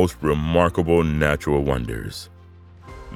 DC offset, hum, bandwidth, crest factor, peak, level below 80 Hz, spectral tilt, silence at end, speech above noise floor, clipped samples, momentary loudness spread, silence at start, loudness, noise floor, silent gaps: under 0.1%; none; 15.5 kHz; 18 dB; -2 dBFS; -34 dBFS; -6.5 dB/octave; 0 s; 25 dB; under 0.1%; 17 LU; 0 s; -21 LUFS; -45 dBFS; none